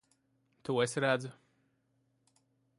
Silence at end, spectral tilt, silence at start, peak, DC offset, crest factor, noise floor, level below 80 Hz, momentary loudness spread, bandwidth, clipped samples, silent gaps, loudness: 1.45 s; -4.5 dB/octave; 0.65 s; -16 dBFS; under 0.1%; 22 dB; -76 dBFS; -80 dBFS; 16 LU; 11.5 kHz; under 0.1%; none; -33 LUFS